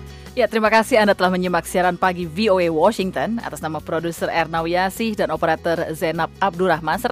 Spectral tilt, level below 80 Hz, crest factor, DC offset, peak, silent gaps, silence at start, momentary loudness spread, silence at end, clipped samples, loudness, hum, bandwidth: -5 dB/octave; -46 dBFS; 16 dB; under 0.1%; -4 dBFS; none; 0 s; 9 LU; 0 s; under 0.1%; -20 LUFS; none; 15.5 kHz